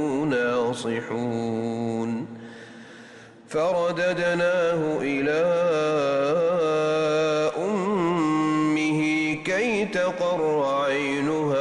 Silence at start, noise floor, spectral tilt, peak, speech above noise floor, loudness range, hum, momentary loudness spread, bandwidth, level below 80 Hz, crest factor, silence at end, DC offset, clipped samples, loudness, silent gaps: 0 s; -46 dBFS; -5.5 dB/octave; -14 dBFS; 23 dB; 5 LU; none; 6 LU; 11 kHz; -62 dBFS; 10 dB; 0 s; under 0.1%; under 0.1%; -24 LUFS; none